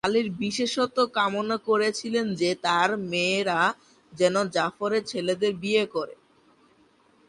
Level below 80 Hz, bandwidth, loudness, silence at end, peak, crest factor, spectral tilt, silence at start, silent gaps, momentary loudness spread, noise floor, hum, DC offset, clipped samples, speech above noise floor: -66 dBFS; 11.5 kHz; -25 LUFS; 1.15 s; -8 dBFS; 18 dB; -4 dB/octave; 0.05 s; none; 5 LU; -61 dBFS; none; under 0.1%; under 0.1%; 36 dB